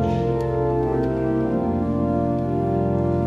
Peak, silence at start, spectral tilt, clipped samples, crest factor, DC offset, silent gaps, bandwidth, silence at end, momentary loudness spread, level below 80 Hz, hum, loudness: -10 dBFS; 0 s; -10 dB/octave; under 0.1%; 10 dB; under 0.1%; none; 7 kHz; 0 s; 1 LU; -38 dBFS; none; -22 LUFS